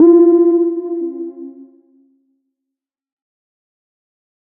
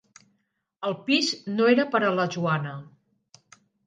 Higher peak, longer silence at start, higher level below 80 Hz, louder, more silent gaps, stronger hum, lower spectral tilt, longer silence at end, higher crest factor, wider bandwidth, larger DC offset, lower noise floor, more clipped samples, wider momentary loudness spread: first, -2 dBFS vs -8 dBFS; second, 0 s vs 0.8 s; about the same, -72 dBFS vs -76 dBFS; first, -13 LUFS vs -24 LUFS; neither; neither; first, -10 dB/octave vs -5 dB/octave; first, 3.05 s vs 1 s; second, 14 dB vs 20 dB; second, 1.8 kHz vs 9.6 kHz; neither; first, -83 dBFS vs -75 dBFS; neither; first, 23 LU vs 12 LU